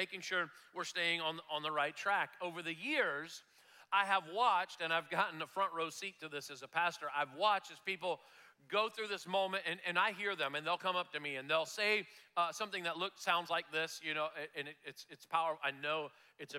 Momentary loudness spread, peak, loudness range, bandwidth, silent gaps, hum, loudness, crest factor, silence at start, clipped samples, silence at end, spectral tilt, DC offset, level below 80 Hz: 10 LU; -20 dBFS; 2 LU; 16.5 kHz; none; none; -37 LUFS; 20 dB; 0 s; under 0.1%; 0 s; -2.5 dB/octave; under 0.1%; under -90 dBFS